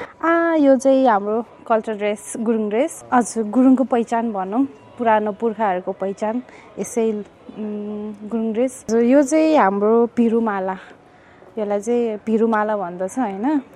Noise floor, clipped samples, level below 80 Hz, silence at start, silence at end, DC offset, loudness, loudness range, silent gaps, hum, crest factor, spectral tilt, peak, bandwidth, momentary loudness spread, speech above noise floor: -47 dBFS; under 0.1%; -64 dBFS; 0 s; 0.1 s; under 0.1%; -19 LUFS; 5 LU; none; none; 18 dB; -5.5 dB/octave; -2 dBFS; 13 kHz; 13 LU; 28 dB